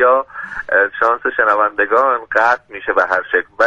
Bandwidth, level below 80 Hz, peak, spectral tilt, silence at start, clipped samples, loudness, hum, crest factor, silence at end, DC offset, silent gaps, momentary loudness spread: 7.8 kHz; -54 dBFS; 0 dBFS; -4 dB/octave; 0 s; under 0.1%; -15 LUFS; none; 16 dB; 0 s; under 0.1%; none; 5 LU